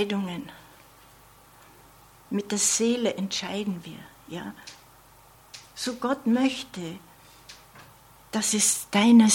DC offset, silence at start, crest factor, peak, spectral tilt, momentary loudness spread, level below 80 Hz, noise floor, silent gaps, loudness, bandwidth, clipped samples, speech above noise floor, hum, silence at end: under 0.1%; 0 s; 20 dB; -6 dBFS; -3 dB/octave; 24 LU; -64 dBFS; -54 dBFS; none; -25 LUFS; 16.5 kHz; under 0.1%; 29 dB; 50 Hz at -60 dBFS; 0 s